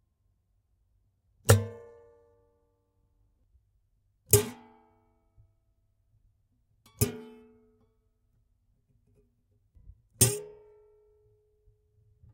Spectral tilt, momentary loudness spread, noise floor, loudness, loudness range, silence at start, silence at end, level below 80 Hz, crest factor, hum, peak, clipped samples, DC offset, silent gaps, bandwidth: -4 dB/octave; 25 LU; -73 dBFS; -27 LUFS; 8 LU; 1.45 s; 1.85 s; -56 dBFS; 32 dB; none; -4 dBFS; under 0.1%; under 0.1%; none; 16 kHz